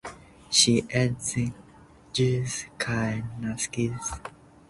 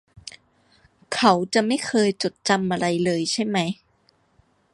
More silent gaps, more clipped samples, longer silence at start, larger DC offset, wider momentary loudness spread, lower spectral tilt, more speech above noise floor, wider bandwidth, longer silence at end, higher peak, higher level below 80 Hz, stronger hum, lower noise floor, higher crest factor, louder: neither; neither; about the same, 0.05 s vs 0.15 s; neither; second, 13 LU vs 17 LU; about the same, -3.5 dB/octave vs -4.5 dB/octave; second, 26 dB vs 42 dB; about the same, 11.5 kHz vs 11.5 kHz; second, 0.4 s vs 1 s; second, -6 dBFS vs -2 dBFS; first, -52 dBFS vs -62 dBFS; neither; second, -52 dBFS vs -63 dBFS; about the same, 22 dB vs 22 dB; second, -26 LUFS vs -22 LUFS